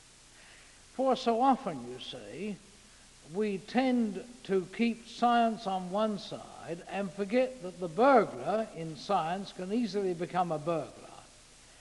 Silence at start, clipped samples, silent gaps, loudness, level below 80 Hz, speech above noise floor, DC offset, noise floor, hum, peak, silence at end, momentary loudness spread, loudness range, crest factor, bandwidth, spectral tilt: 0.4 s; under 0.1%; none; -31 LUFS; -64 dBFS; 25 dB; under 0.1%; -56 dBFS; none; -10 dBFS; 0.55 s; 15 LU; 4 LU; 22 dB; 11.5 kHz; -5.5 dB/octave